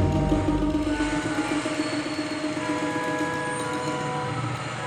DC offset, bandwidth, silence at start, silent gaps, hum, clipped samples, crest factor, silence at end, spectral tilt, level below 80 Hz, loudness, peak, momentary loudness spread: under 0.1%; 12 kHz; 0 s; none; none; under 0.1%; 16 dB; 0 s; -5.5 dB/octave; -38 dBFS; -27 LUFS; -10 dBFS; 5 LU